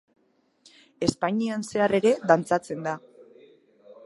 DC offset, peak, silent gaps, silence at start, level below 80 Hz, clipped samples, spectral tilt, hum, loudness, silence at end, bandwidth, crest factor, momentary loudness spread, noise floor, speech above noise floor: under 0.1%; -4 dBFS; none; 1 s; -60 dBFS; under 0.1%; -5.5 dB/octave; none; -25 LUFS; 0.15 s; 11.5 kHz; 24 dB; 10 LU; -64 dBFS; 40 dB